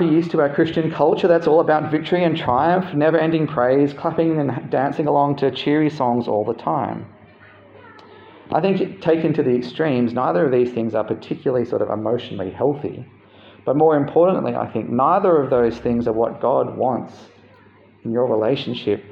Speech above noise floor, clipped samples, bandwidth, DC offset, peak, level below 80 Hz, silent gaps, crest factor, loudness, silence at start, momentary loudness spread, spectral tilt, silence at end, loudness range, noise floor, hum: 31 dB; under 0.1%; 7 kHz; under 0.1%; -4 dBFS; -56 dBFS; none; 16 dB; -19 LUFS; 0 s; 8 LU; -8.5 dB/octave; 0 s; 5 LU; -50 dBFS; none